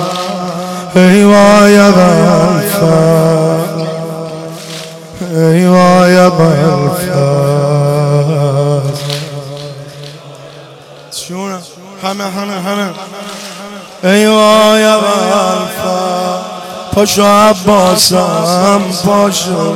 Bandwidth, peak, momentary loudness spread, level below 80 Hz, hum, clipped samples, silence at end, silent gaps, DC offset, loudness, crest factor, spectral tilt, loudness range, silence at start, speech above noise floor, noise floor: 17 kHz; 0 dBFS; 18 LU; -46 dBFS; none; under 0.1%; 0 s; none; under 0.1%; -9 LUFS; 10 dB; -5.5 dB/octave; 13 LU; 0 s; 26 dB; -33 dBFS